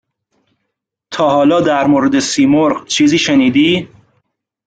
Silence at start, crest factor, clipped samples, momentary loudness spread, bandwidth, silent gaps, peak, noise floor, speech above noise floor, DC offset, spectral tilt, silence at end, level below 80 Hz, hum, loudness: 1.1 s; 12 dB; under 0.1%; 4 LU; 9.2 kHz; none; -2 dBFS; -74 dBFS; 63 dB; under 0.1%; -4.5 dB/octave; 0.8 s; -52 dBFS; none; -12 LUFS